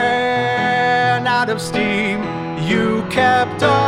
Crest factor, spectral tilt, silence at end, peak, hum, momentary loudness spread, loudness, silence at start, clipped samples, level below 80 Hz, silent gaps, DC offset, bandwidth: 14 dB; -5 dB/octave; 0 s; -2 dBFS; none; 5 LU; -17 LUFS; 0 s; under 0.1%; -50 dBFS; none; under 0.1%; 15.5 kHz